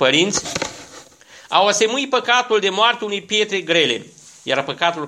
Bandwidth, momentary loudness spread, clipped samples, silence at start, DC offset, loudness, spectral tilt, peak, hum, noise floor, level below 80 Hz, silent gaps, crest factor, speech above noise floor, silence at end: 13.5 kHz; 10 LU; under 0.1%; 0 s; under 0.1%; -18 LUFS; -2 dB/octave; 0 dBFS; none; -45 dBFS; -58 dBFS; none; 18 dB; 27 dB; 0 s